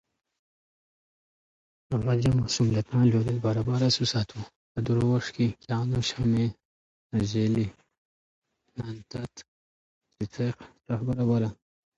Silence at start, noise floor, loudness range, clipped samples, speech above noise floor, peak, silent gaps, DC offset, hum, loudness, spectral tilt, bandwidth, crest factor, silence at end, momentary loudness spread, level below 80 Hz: 1.9 s; under -90 dBFS; 8 LU; under 0.1%; over 64 dB; -10 dBFS; 4.56-4.75 s, 6.65-7.10 s, 7.98-8.42 s, 9.48-10.01 s; under 0.1%; none; -27 LUFS; -6.5 dB/octave; 8 kHz; 18 dB; 0.45 s; 14 LU; -52 dBFS